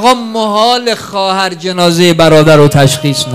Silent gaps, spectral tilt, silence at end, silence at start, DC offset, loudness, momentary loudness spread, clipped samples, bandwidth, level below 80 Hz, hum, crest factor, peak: none; -5 dB/octave; 0 s; 0 s; under 0.1%; -8 LUFS; 8 LU; 2%; 16 kHz; -40 dBFS; none; 8 dB; 0 dBFS